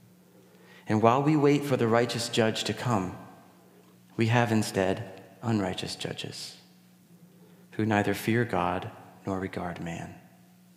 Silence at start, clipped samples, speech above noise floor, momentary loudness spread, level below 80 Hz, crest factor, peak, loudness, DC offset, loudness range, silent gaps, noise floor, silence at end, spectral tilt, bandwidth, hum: 0.75 s; under 0.1%; 30 dB; 18 LU; -66 dBFS; 24 dB; -6 dBFS; -28 LUFS; under 0.1%; 6 LU; none; -57 dBFS; 0.55 s; -5.5 dB/octave; 16 kHz; none